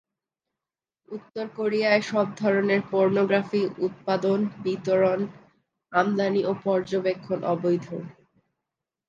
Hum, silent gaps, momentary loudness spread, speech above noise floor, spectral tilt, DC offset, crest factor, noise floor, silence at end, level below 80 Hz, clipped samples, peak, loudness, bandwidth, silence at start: none; none; 12 LU; 66 dB; -7 dB/octave; under 0.1%; 20 dB; -90 dBFS; 0.95 s; -72 dBFS; under 0.1%; -6 dBFS; -25 LUFS; 7.6 kHz; 1.1 s